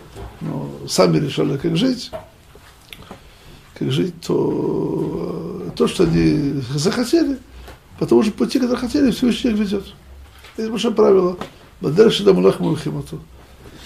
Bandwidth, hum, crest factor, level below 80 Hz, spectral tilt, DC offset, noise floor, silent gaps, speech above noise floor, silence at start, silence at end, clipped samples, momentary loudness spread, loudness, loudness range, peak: 15 kHz; none; 18 dB; -44 dBFS; -6 dB/octave; under 0.1%; -45 dBFS; none; 28 dB; 0 s; 0 s; under 0.1%; 17 LU; -18 LUFS; 6 LU; 0 dBFS